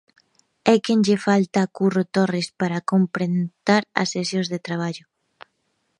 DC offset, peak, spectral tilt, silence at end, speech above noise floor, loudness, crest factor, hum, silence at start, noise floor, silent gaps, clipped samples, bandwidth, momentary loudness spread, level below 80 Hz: under 0.1%; 0 dBFS; -5.5 dB/octave; 1 s; 51 dB; -21 LUFS; 22 dB; none; 0.65 s; -71 dBFS; none; under 0.1%; 11 kHz; 8 LU; -68 dBFS